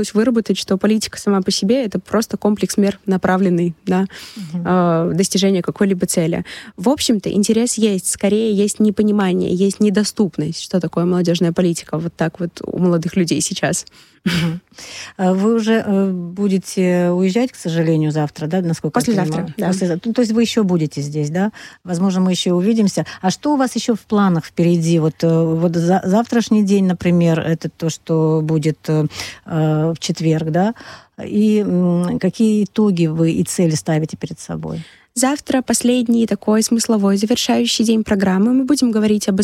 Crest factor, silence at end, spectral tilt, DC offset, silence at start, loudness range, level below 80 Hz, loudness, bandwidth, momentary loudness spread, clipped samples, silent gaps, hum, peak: 14 dB; 0 s; -5.5 dB/octave; under 0.1%; 0 s; 3 LU; -52 dBFS; -17 LUFS; 15 kHz; 7 LU; under 0.1%; none; none; -4 dBFS